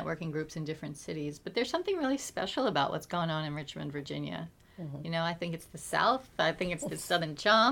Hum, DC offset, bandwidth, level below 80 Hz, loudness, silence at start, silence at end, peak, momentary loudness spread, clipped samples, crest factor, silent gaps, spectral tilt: none; under 0.1%; 18.5 kHz; -62 dBFS; -33 LUFS; 0 s; 0 s; -12 dBFS; 11 LU; under 0.1%; 20 dB; none; -4.5 dB/octave